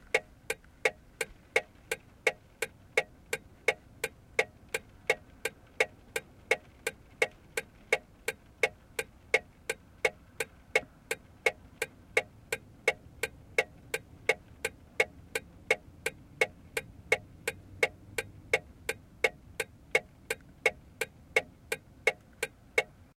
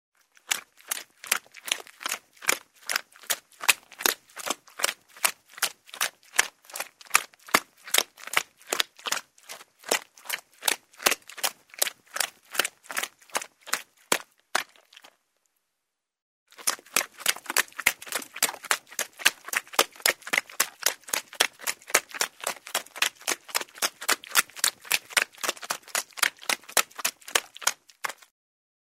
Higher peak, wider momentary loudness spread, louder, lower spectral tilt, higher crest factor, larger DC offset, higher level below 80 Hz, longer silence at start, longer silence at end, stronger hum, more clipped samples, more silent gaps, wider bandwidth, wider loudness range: second, -10 dBFS vs 0 dBFS; about the same, 8 LU vs 9 LU; second, -34 LUFS vs -27 LUFS; first, -2 dB/octave vs 1.5 dB/octave; about the same, 26 dB vs 30 dB; neither; first, -60 dBFS vs -72 dBFS; second, 0.15 s vs 0.5 s; second, 0.3 s vs 0.75 s; neither; neither; second, none vs 16.22-16.46 s; about the same, 16.5 kHz vs 16 kHz; second, 1 LU vs 5 LU